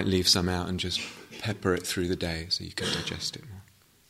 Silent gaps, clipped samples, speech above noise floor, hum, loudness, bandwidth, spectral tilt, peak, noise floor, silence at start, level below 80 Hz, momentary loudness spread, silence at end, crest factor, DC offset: none; under 0.1%; 27 dB; none; -28 LUFS; 16 kHz; -3.5 dB/octave; -8 dBFS; -57 dBFS; 0 s; -52 dBFS; 13 LU; 0.45 s; 22 dB; under 0.1%